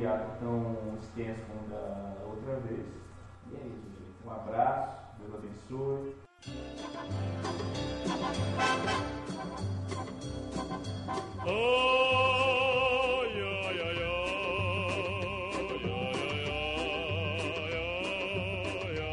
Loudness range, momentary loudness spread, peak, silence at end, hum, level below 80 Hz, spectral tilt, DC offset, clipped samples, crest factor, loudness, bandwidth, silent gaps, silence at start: 10 LU; 18 LU; -16 dBFS; 0 s; none; -52 dBFS; -5 dB/octave; under 0.1%; under 0.1%; 18 dB; -32 LUFS; 11 kHz; none; 0 s